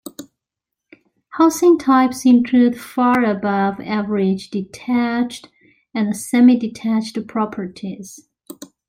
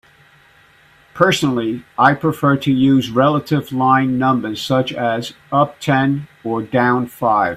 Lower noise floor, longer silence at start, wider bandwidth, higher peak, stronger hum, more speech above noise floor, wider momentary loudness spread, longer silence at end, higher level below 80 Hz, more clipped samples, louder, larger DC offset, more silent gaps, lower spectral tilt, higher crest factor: first, -83 dBFS vs -50 dBFS; second, 0.05 s vs 1.15 s; first, 16 kHz vs 14.5 kHz; about the same, -2 dBFS vs 0 dBFS; neither; first, 66 dB vs 34 dB; first, 17 LU vs 6 LU; first, 0.25 s vs 0 s; second, -60 dBFS vs -54 dBFS; neither; about the same, -17 LUFS vs -16 LUFS; neither; neither; about the same, -5.5 dB/octave vs -6 dB/octave; about the same, 16 dB vs 16 dB